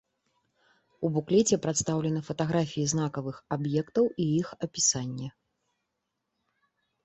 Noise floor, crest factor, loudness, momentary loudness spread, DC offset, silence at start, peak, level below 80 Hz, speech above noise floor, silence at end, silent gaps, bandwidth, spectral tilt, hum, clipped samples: -82 dBFS; 18 dB; -28 LUFS; 10 LU; under 0.1%; 1 s; -12 dBFS; -62 dBFS; 54 dB; 1.75 s; none; 8.4 kHz; -5 dB/octave; none; under 0.1%